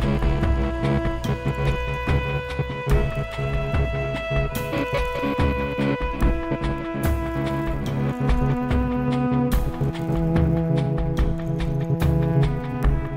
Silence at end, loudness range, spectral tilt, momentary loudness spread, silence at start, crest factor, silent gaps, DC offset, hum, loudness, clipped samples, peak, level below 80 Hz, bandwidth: 0 s; 2 LU; -7.5 dB/octave; 5 LU; 0 s; 14 dB; none; under 0.1%; none; -24 LUFS; under 0.1%; -8 dBFS; -28 dBFS; 16 kHz